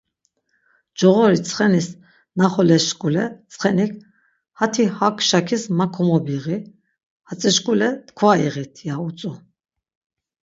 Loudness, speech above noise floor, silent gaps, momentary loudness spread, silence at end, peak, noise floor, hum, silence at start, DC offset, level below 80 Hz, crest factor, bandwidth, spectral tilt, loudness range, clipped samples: -19 LUFS; 51 dB; 7.03-7.20 s; 13 LU; 1.05 s; 0 dBFS; -70 dBFS; none; 1 s; under 0.1%; -64 dBFS; 20 dB; 8 kHz; -5 dB/octave; 3 LU; under 0.1%